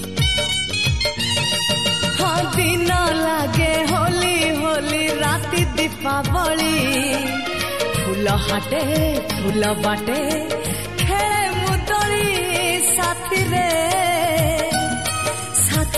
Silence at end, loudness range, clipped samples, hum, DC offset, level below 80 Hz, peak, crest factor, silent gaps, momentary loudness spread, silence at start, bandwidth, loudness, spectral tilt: 0 s; 2 LU; under 0.1%; none; 1%; -34 dBFS; -4 dBFS; 14 dB; none; 4 LU; 0 s; 15.5 kHz; -19 LUFS; -3.5 dB/octave